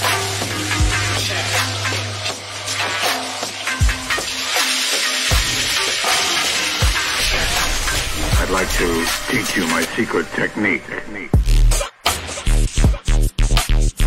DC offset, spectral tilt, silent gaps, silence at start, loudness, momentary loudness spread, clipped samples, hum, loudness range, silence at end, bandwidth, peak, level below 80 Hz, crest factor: under 0.1%; -3 dB/octave; none; 0 s; -18 LUFS; 6 LU; under 0.1%; none; 3 LU; 0 s; 16.5 kHz; -2 dBFS; -22 dBFS; 16 dB